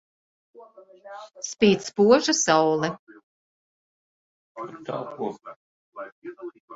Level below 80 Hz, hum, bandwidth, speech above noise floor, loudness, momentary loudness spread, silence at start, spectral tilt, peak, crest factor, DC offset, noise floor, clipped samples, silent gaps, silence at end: -66 dBFS; none; 8 kHz; over 66 dB; -22 LUFS; 23 LU; 0.6 s; -3.5 dB/octave; -4 dBFS; 22 dB; under 0.1%; under -90 dBFS; under 0.1%; 2.99-3.07 s, 3.23-4.55 s, 5.56-5.92 s, 6.12-6.22 s, 6.60-6.68 s; 0 s